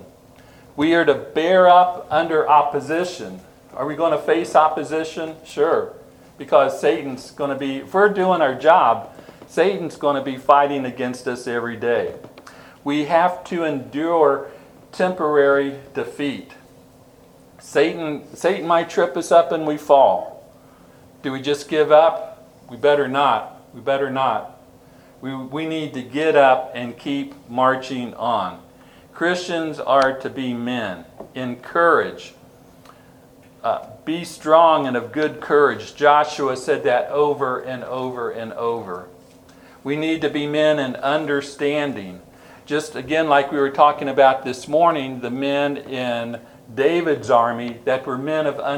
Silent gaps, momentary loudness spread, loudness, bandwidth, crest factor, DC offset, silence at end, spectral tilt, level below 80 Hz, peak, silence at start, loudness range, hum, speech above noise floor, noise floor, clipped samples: none; 14 LU; -19 LUFS; 17.5 kHz; 20 dB; under 0.1%; 0 s; -5 dB/octave; -62 dBFS; 0 dBFS; 0 s; 5 LU; none; 30 dB; -49 dBFS; under 0.1%